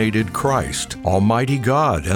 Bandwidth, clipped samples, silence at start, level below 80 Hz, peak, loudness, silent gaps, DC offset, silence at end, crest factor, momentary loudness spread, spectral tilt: 19 kHz; under 0.1%; 0 s; -38 dBFS; -4 dBFS; -19 LUFS; none; under 0.1%; 0 s; 14 dB; 4 LU; -5.5 dB/octave